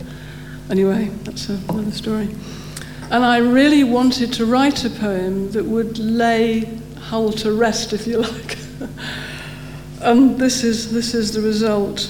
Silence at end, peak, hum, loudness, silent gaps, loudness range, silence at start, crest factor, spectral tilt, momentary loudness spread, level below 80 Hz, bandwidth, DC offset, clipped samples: 0 s; -2 dBFS; none; -18 LUFS; none; 5 LU; 0 s; 16 dB; -5 dB/octave; 18 LU; -42 dBFS; 18 kHz; 0.3%; under 0.1%